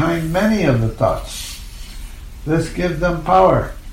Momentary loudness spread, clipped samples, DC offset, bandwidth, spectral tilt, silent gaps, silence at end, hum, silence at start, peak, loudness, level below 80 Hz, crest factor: 22 LU; under 0.1%; under 0.1%; 16.5 kHz; -6.5 dB/octave; none; 0 s; none; 0 s; -2 dBFS; -17 LUFS; -30 dBFS; 16 dB